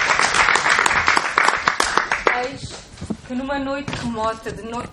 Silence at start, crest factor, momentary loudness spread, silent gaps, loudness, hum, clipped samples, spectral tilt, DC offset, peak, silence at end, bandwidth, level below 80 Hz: 0 s; 20 dB; 16 LU; none; -18 LUFS; none; under 0.1%; -2 dB/octave; under 0.1%; 0 dBFS; 0 s; 14 kHz; -44 dBFS